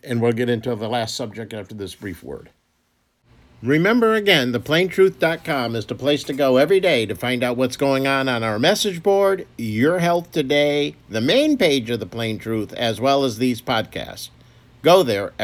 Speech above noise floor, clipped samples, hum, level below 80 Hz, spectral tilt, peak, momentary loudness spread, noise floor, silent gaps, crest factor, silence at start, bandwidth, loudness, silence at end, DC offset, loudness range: 47 dB; under 0.1%; none; -56 dBFS; -5 dB/octave; 0 dBFS; 15 LU; -66 dBFS; none; 20 dB; 0.05 s; 17.5 kHz; -19 LUFS; 0 s; under 0.1%; 5 LU